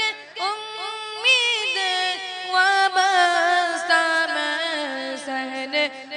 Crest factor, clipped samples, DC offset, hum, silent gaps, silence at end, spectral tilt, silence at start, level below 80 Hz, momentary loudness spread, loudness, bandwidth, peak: 16 dB; under 0.1%; under 0.1%; none; none; 0 s; 0.5 dB/octave; 0 s; -82 dBFS; 11 LU; -21 LUFS; 10.5 kHz; -6 dBFS